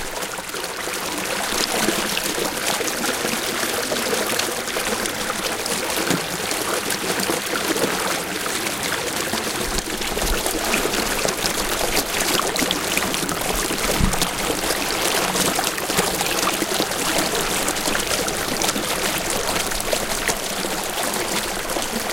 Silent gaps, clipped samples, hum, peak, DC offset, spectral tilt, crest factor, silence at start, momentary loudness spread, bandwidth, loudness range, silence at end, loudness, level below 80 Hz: none; under 0.1%; none; -2 dBFS; under 0.1%; -2 dB/octave; 22 dB; 0 s; 4 LU; 17 kHz; 2 LU; 0 s; -21 LUFS; -38 dBFS